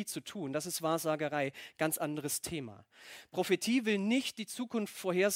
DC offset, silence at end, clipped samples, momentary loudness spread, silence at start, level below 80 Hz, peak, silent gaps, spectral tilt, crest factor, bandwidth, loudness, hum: under 0.1%; 0 s; under 0.1%; 11 LU; 0 s; -72 dBFS; -16 dBFS; none; -4 dB/octave; 18 dB; 16.5 kHz; -34 LUFS; none